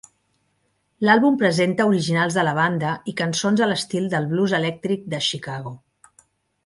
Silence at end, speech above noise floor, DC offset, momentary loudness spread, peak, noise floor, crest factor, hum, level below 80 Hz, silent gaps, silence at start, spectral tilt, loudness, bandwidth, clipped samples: 0.9 s; 48 dB; under 0.1%; 9 LU; -2 dBFS; -69 dBFS; 20 dB; none; -64 dBFS; none; 1 s; -5 dB/octave; -21 LUFS; 11.5 kHz; under 0.1%